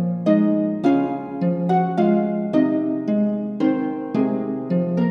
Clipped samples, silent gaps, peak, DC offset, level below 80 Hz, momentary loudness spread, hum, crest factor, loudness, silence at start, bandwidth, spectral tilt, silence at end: under 0.1%; none; -6 dBFS; under 0.1%; -64 dBFS; 5 LU; none; 14 dB; -21 LUFS; 0 s; 6.4 kHz; -10 dB/octave; 0 s